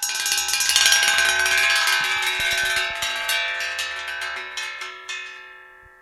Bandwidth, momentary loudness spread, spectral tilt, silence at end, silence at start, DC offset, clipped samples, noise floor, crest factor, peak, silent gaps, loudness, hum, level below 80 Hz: 16.5 kHz; 16 LU; 2 dB/octave; 0.3 s; 0 s; under 0.1%; under 0.1%; -46 dBFS; 22 dB; 0 dBFS; none; -19 LUFS; none; -54 dBFS